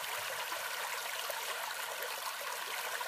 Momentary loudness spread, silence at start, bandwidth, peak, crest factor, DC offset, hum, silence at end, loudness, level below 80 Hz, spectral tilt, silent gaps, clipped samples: 1 LU; 0 s; 15.5 kHz; -22 dBFS; 18 dB; under 0.1%; none; 0 s; -38 LUFS; -86 dBFS; 1.5 dB/octave; none; under 0.1%